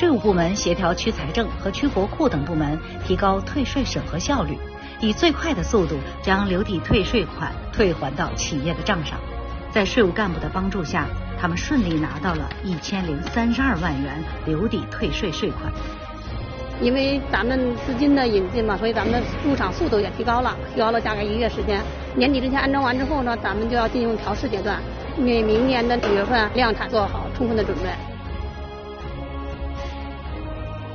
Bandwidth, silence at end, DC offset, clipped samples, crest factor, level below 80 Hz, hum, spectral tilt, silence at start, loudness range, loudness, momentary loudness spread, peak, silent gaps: 6.8 kHz; 0 s; under 0.1%; under 0.1%; 18 dB; -32 dBFS; none; -4.5 dB/octave; 0 s; 3 LU; -23 LUFS; 12 LU; -4 dBFS; none